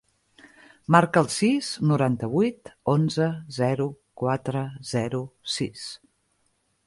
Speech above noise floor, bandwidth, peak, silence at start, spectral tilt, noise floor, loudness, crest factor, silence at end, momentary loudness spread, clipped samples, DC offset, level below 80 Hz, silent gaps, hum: 46 dB; 11.5 kHz; -4 dBFS; 0.9 s; -6 dB/octave; -70 dBFS; -25 LUFS; 22 dB; 0.9 s; 11 LU; under 0.1%; under 0.1%; -62 dBFS; none; none